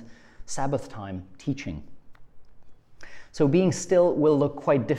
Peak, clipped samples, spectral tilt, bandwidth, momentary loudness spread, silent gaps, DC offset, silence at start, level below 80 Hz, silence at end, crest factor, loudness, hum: -10 dBFS; under 0.1%; -6.5 dB/octave; 11.5 kHz; 16 LU; none; under 0.1%; 0 s; -52 dBFS; 0 s; 16 dB; -24 LUFS; none